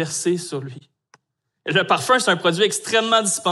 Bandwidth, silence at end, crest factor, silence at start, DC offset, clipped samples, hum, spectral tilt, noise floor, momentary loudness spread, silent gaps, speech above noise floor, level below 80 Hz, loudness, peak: 13.5 kHz; 0 s; 18 dB; 0 s; under 0.1%; under 0.1%; none; -3 dB/octave; -70 dBFS; 14 LU; none; 50 dB; -74 dBFS; -19 LUFS; -4 dBFS